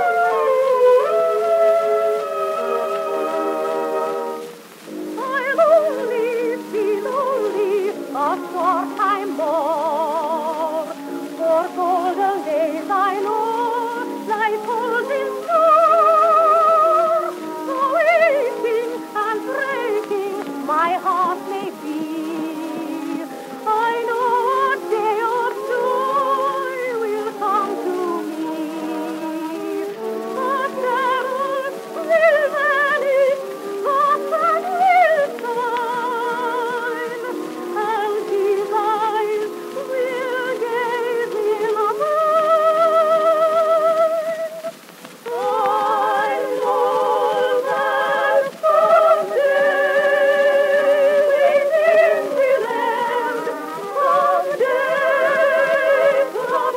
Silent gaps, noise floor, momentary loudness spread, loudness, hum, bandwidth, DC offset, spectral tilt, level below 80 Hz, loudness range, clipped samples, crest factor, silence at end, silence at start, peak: none; -40 dBFS; 11 LU; -19 LUFS; none; 16 kHz; under 0.1%; -3.5 dB/octave; -84 dBFS; 7 LU; under 0.1%; 14 dB; 0 s; 0 s; -4 dBFS